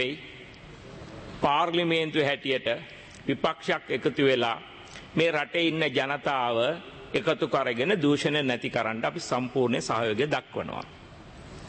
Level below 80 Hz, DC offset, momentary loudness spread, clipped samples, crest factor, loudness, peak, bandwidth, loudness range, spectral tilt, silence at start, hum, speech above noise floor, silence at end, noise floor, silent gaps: -58 dBFS; under 0.1%; 20 LU; under 0.1%; 18 dB; -27 LUFS; -10 dBFS; 8.8 kHz; 2 LU; -5 dB/octave; 0 s; none; 20 dB; 0 s; -46 dBFS; none